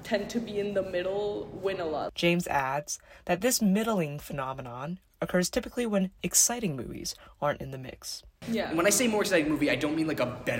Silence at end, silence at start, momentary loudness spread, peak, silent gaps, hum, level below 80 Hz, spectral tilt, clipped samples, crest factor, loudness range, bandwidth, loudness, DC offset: 0 s; 0 s; 13 LU; -10 dBFS; none; none; -56 dBFS; -3.5 dB/octave; under 0.1%; 20 dB; 2 LU; 16.5 kHz; -29 LUFS; under 0.1%